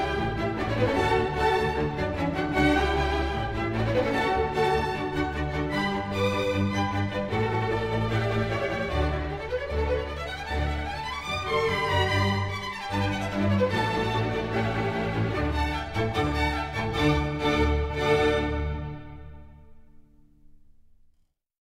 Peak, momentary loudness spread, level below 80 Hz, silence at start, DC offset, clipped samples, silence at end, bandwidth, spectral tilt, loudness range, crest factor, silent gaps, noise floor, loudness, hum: -10 dBFS; 6 LU; -36 dBFS; 0 s; under 0.1%; under 0.1%; 1.6 s; 15 kHz; -6 dB/octave; 3 LU; 16 dB; none; -68 dBFS; -27 LUFS; none